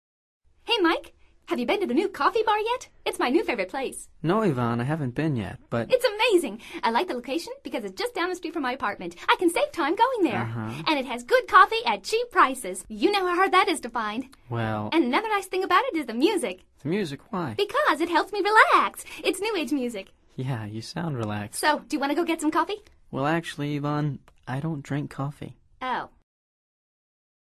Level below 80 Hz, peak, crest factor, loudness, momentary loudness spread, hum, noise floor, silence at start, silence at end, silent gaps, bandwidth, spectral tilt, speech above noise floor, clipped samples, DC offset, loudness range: -58 dBFS; -4 dBFS; 22 dB; -25 LUFS; 12 LU; none; -49 dBFS; 0.65 s; 1.5 s; none; 13.5 kHz; -5 dB/octave; 24 dB; under 0.1%; under 0.1%; 6 LU